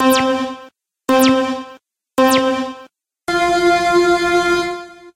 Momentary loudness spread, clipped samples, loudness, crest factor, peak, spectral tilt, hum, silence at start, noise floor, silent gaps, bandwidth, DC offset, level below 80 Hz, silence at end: 15 LU; under 0.1%; -15 LUFS; 16 dB; 0 dBFS; -3.5 dB/octave; none; 0 s; -44 dBFS; none; 16 kHz; under 0.1%; -48 dBFS; 0.05 s